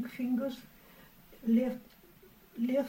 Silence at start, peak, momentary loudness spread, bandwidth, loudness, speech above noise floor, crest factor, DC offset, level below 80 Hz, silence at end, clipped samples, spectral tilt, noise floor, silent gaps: 0 s; -18 dBFS; 19 LU; 16 kHz; -33 LUFS; 27 dB; 16 dB; under 0.1%; -66 dBFS; 0 s; under 0.1%; -7 dB/octave; -59 dBFS; none